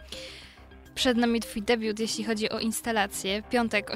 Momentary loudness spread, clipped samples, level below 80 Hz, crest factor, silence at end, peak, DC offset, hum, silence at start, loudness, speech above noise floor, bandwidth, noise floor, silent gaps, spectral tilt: 14 LU; under 0.1%; -52 dBFS; 18 dB; 0 s; -10 dBFS; under 0.1%; none; 0 s; -27 LUFS; 22 dB; 16 kHz; -50 dBFS; none; -3 dB/octave